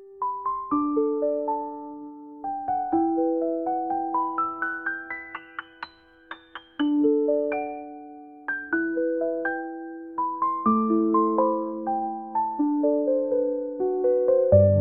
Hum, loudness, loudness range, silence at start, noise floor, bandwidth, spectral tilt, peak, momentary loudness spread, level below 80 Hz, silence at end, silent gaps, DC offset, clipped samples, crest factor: none; -25 LUFS; 5 LU; 0 s; -45 dBFS; 4.3 kHz; -7 dB/octave; -6 dBFS; 17 LU; -64 dBFS; 0 s; none; under 0.1%; under 0.1%; 20 dB